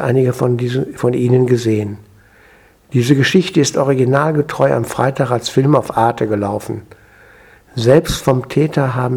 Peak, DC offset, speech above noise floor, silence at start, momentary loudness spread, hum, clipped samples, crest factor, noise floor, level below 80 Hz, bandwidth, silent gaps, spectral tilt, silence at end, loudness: 0 dBFS; under 0.1%; 33 dB; 0 s; 8 LU; none; under 0.1%; 16 dB; -47 dBFS; -44 dBFS; 16.5 kHz; none; -6 dB/octave; 0 s; -15 LUFS